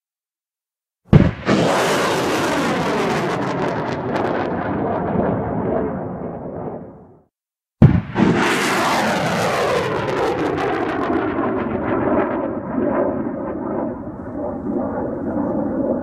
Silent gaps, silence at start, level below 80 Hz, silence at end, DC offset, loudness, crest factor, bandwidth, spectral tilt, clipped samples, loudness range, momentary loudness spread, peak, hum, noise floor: none; 1.1 s; -38 dBFS; 0 s; under 0.1%; -20 LUFS; 20 dB; 15.5 kHz; -6 dB/octave; under 0.1%; 5 LU; 11 LU; 0 dBFS; none; under -90 dBFS